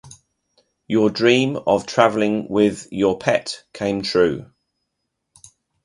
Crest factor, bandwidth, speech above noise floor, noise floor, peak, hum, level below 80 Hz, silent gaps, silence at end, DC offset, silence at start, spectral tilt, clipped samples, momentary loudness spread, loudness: 20 dB; 11.5 kHz; 58 dB; -77 dBFS; 0 dBFS; none; -54 dBFS; none; 1.4 s; under 0.1%; 0.05 s; -5 dB/octave; under 0.1%; 7 LU; -19 LUFS